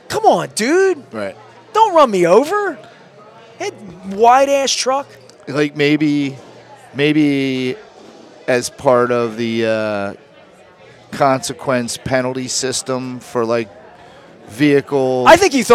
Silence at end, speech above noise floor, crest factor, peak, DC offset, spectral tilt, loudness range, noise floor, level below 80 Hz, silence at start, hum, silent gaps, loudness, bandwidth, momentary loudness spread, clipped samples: 0 s; 29 dB; 16 dB; 0 dBFS; under 0.1%; -4 dB/octave; 5 LU; -44 dBFS; -54 dBFS; 0.1 s; none; none; -15 LUFS; 15.5 kHz; 16 LU; under 0.1%